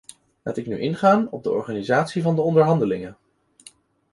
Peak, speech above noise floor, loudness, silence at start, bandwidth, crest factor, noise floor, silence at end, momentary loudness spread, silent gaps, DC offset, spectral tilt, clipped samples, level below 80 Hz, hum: -4 dBFS; 31 dB; -21 LUFS; 0.45 s; 11.5 kHz; 18 dB; -51 dBFS; 1 s; 12 LU; none; under 0.1%; -7.5 dB/octave; under 0.1%; -60 dBFS; none